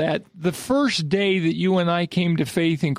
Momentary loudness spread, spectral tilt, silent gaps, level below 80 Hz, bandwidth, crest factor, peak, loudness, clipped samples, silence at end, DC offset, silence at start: 5 LU; -6 dB/octave; none; -58 dBFS; 15.5 kHz; 14 dB; -8 dBFS; -21 LUFS; under 0.1%; 0 s; under 0.1%; 0 s